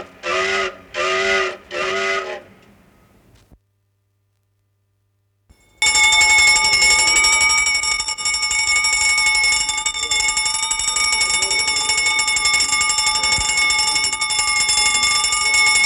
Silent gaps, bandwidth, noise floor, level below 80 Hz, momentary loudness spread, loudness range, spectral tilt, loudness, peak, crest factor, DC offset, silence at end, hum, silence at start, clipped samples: none; 20 kHz; -66 dBFS; -44 dBFS; 9 LU; 11 LU; 1 dB/octave; -15 LUFS; -4 dBFS; 14 dB; under 0.1%; 0 s; none; 0 s; under 0.1%